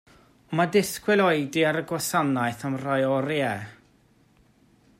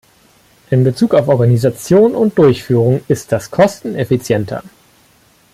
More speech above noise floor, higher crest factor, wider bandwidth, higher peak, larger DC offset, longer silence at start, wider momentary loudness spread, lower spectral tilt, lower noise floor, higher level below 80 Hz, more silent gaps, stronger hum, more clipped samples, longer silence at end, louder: about the same, 36 dB vs 38 dB; first, 18 dB vs 12 dB; about the same, 16 kHz vs 15 kHz; second, -8 dBFS vs 0 dBFS; neither; second, 0.5 s vs 0.7 s; about the same, 8 LU vs 7 LU; second, -5 dB/octave vs -7.5 dB/octave; first, -61 dBFS vs -51 dBFS; second, -66 dBFS vs -48 dBFS; neither; neither; neither; first, 1.25 s vs 0.85 s; second, -25 LUFS vs -13 LUFS